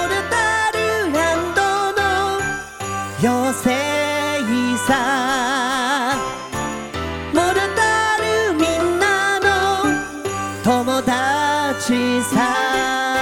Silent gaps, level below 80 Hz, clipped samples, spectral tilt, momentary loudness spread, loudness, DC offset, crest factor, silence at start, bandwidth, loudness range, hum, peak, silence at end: none; -44 dBFS; under 0.1%; -3.5 dB/octave; 8 LU; -18 LUFS; under 0.1%; 16 dB; 0 s; 17 kHz; 2 LU; none; -2 dBFS; 0 s